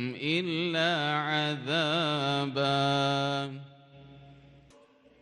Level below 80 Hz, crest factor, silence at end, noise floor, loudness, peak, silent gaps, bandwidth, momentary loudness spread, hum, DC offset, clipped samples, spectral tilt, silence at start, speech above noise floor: -72 dBFS; 14 dB; 0.85 s; -59 dBFS; -28 LUFS; -16 dBFS; none; 11 kHz; 4 LU; none; under 0.1%; under 0.1%; -5 dB/octave; 0 s; 30 dB